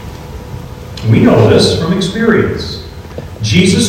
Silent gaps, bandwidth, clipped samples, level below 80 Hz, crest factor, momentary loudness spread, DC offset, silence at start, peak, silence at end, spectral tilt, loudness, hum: none; 15.5 kHz; 0.9%; -34 dBFS; 12 dB; 20 LU; under 0.1%; 0 s; 0 dBFS; 0 s; -5.5 dB/octave; -11 LUFS; none